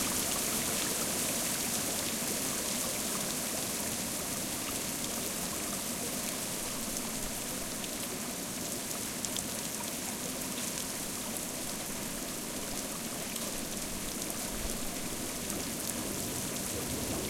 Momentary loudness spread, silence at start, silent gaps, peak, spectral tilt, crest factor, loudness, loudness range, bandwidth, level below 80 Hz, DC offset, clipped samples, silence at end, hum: 5 LU; 0 s; none; -14 dBFS; -2 dB/octave; 20 dB; -34 LUFS; 4 LU; 17 kHz; -54 dBFS; under 0.1%; under 0.1%; 0 s; none